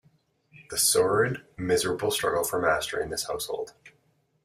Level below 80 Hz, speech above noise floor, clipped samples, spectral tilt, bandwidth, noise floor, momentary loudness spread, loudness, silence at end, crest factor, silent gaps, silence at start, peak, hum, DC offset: -58 dBFS; 42 dB; under 0.1%; -2.5 dB/octave; 16 kHz; -68 dBFS; 11 LU; -26 LUFS; 0.55 s; 18 dB; none; 0.55 s; -10 dBFS; none; under 0.1%